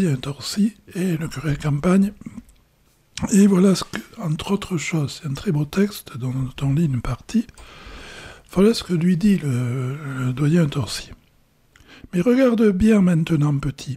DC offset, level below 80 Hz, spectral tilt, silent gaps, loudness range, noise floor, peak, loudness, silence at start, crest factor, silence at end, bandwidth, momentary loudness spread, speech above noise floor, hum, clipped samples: under 0.1%; -44 dBFS; -6.5 dB/octave; none; 4 LU; -59 dBFS; -6 dBFS; -21 LUFS; 0 s; 16 dB; 0 s; 14.5 kHz; 14 LU; 39 dB; none; under 0.1%